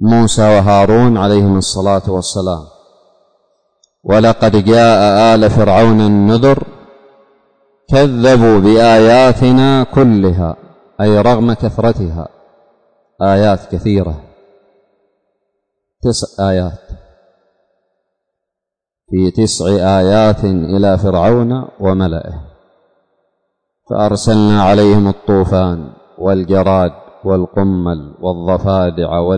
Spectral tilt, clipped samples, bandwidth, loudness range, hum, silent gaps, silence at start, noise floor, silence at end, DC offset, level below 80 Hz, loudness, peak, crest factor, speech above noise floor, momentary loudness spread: -6.5 dB/octave; under 0.1%; 9.6 kHz; 11 LU; none; none; 0 s; -83 dBFS; 0 s; under 0.1%; -34 dBFS; -11 LUFS; -2 dBFS; 10 dB; 73 dB; 12 LU